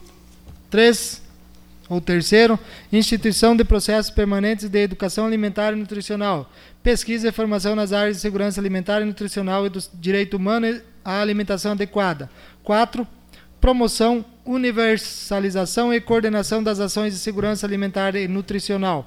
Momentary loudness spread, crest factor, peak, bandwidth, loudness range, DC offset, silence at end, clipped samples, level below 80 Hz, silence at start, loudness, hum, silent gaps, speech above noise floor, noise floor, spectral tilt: 10 LU; 18 dB; -4 dBFS; 15.5 kHz; 4 LU; under 0.1%; 0 s; under 0.1%; -32 dBFS; 0 s; -20 LUFS; none; none; 26 dB; -45 dBFS; -4.5 dB/octave